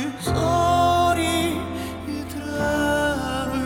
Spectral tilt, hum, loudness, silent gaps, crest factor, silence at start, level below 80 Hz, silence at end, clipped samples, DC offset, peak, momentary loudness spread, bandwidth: -5 dB/octave; none; -22 LUFS; none; 14 dB; 0 s; -42 dBFS; 0 s; under 0.1%; under 0.1%; -8 dBFS; 12 LU; 17 kHz